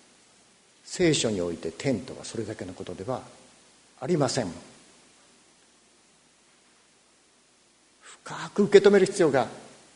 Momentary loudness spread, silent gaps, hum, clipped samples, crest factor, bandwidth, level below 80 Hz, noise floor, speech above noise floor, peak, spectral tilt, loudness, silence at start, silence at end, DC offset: 19 LU; none; none; under 0.1%; 26 dB; 10.5 kHz; -64 dBFS; -62 dBFS; 37 dB; -2 dBFS; -5 dB/octave; -25 LUFS; 0.85 s; 0.3 s; under 0.1%